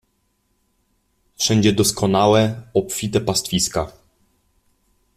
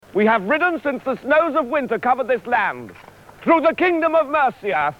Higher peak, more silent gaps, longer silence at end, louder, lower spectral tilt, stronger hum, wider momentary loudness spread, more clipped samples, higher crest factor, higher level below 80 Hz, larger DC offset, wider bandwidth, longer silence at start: about the same, -4 dBFS vs -4 dBFS; neither; first, 1.25 s vs 0.05 s; about the same, -18 LUFS vs -19 LUFS; second, -4.5 dB/octave vs -6.5 dB/octave; neither; about the same, 7 LU vs 7 LU; neither; about the same, 18 dB vs 14 dB; first, -48 dBFS vs -58 dBFS; neither; first, 16 kHz vs 13.5 kHz; first, 1.4 s vs 0.15 s